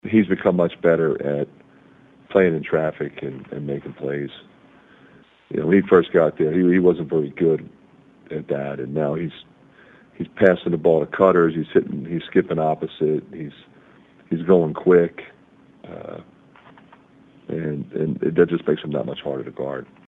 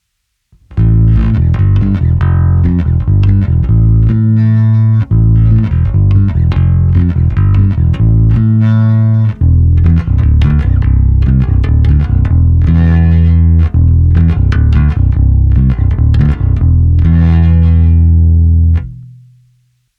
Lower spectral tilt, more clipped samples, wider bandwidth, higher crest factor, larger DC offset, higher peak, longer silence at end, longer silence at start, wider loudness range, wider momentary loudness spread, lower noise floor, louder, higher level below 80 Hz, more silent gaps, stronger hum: about the same, -9.5 dB/octave vs -10.5 dB/octave; neither; about the same, 4 kHz vs 4 kHz; first, 22 dB vs 8 dB; neither; about the same, 0 dBFS vs 0 dBFS; second, 0.25 s vs 0.9 s; second, 0.05 s vs 0.7 s; first, 6 LU vs 1 LU; first, 16 LU vs 3 LU; second, -52 dBFS vs -66 dBFS; second, -21 LUFS vs -10 LUFS; second, -58 dBFS vs -14 dBFS; neither; neither